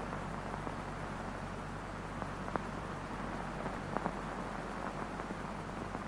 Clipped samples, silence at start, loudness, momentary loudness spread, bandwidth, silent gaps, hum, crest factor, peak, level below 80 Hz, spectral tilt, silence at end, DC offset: under 0.1%; 0 s; -41 LUFS; 3 LU; 16 kHz; none; none; 26 dB; -14 dBFS; -52 dBFS; -6 dB/octave; 0 s; under 0.1%